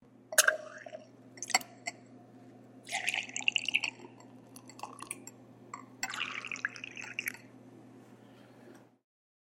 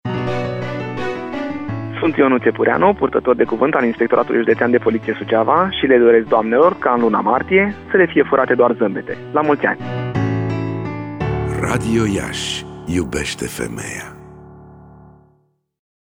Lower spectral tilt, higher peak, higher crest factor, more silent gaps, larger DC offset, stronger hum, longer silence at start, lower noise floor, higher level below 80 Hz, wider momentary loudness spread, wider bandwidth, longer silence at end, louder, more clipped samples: second, 0 dB/octave vs -6 dB/octave; second, -6 dBFS vs -2 dBFS; first, 32 dB vs 16 dB; neither; neither; neither; first, 0.3 s vs 0.05 s; about the same, -57 dBFS vs -60 dBFS; second, -84 dBFS vs -42 dBFS; first, 26 LU vs 11 LU; second, 16 kHz vs 19.5 kHz; second, 0.7 s vs 1.25 s; second, -33 LUFS vs -17 LUFS; neither